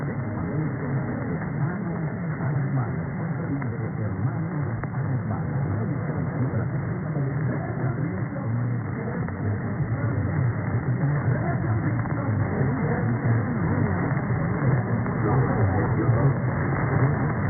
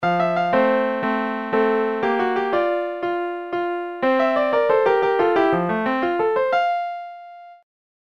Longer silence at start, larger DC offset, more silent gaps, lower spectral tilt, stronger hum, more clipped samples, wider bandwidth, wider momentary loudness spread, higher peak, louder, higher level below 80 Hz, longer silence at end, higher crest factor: about the same, 0 s vs 0 s; second, under 0.1% vs 0.2%; neither; first, -14 dB/octave vs -7 dB/octave; neither; neither; second, 2.3 kHz vs 6.8 kHz; about the same, 6 LU vs 8 LU; second, -10 dBFS vs -6 dBFS; second, -26 LUFS vs -20 LUFS; first, -46 dBFS vs -64 dBFS; second, 0 s vs 0.5 s; about the same, 14 dB vs 16 dB